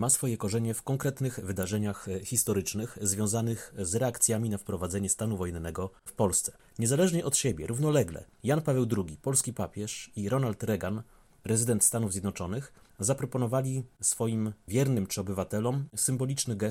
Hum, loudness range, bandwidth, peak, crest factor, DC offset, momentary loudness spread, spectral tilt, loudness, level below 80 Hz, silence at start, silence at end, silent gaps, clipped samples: none; 2 LU; 16.5 kHz; -10 dBFS; 20 dB; under 0.1%; 10 LU; -5 dB/octave; -30 LUFS; -56 dBFS; 0 s; 0 s; none; under 0.1%